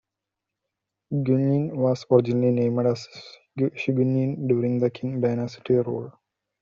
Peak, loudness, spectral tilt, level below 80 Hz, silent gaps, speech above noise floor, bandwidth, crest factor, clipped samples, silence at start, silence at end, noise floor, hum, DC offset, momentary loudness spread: -4 dBFS; -24 LUFS; -8.5 dB/octave; -64 dBFS; none; 62 dB; 7.4 kHz; 20 dB; under 0.1%; 1.1 s; 0.5 s; -85 dBFS; none; under 0.1%; 11 LU